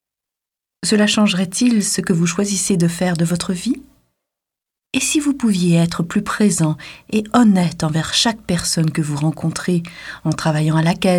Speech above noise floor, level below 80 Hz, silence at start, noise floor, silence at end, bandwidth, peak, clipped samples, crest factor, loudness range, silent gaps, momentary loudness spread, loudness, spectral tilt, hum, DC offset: 69 dB; -48 dBFS; 0.8 s; -86 dBFS; 0 s; 16 kHz; -2 dBFS; under 0.1%; 16 dB; 3 LU; none; 8 LU; -17 LUFS; -4.5 dB/octave; none; under 0.1%